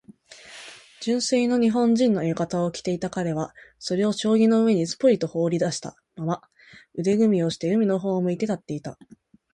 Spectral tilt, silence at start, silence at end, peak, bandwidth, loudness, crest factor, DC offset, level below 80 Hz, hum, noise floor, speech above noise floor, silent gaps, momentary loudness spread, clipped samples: -6 dB/octave; 0.1 s; 0.6 s; -8 dBFS; 11 kHz; -23 LUFS; 16 dB; under 0.1%; -62 dBFS; none; -48 dBFS; 25 dB; none; 15 LU; under 0.1%